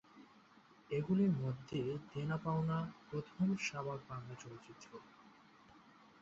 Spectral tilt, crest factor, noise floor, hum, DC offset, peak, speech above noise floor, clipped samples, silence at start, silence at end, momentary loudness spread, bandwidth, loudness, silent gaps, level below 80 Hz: -7 dB/octave; 16 dB; -65 dBFS; none; under 0.1%; -24 dBFS; 26 dB; under 0.1%; 0.15 s; 0.3 s; 20 LU; 7.6 kHz; -40 LUFS; none; -72 dBFS